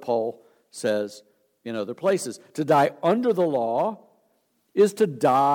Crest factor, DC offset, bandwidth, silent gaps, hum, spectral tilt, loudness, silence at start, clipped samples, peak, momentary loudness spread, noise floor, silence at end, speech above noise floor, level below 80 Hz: 16 dB; under 0.1%; 17.5 kHz; none; none; -5.5 dB/octave; -24 LUFS; 0 s; under 0.1%; -8 dBFS; 13 LU; -69 dBFS; 0 s; 46 dB; -80 dBFS